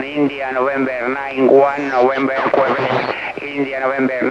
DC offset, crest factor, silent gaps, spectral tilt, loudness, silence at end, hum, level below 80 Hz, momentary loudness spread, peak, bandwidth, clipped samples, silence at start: under 0.1%; 16 dB; none; -6.5 dB/octave; -17 LUFS; 0 s; none; -56 dBFS; 9 LU; 0 dBFS; 7.8 kHz; under 0.1%; 0 s